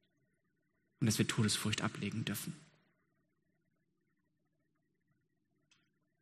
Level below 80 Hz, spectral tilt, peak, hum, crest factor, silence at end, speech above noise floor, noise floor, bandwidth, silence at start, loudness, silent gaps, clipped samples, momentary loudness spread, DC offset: -74 dBFS; -4 dB/octave; -18 dBFS; none; 24 dB; 3.55 s; 46 dB; -82 dBFS; 13.5 kHz; 1 s; -36 LUFS; none; under 0.1%; 11 LU; under 0.1%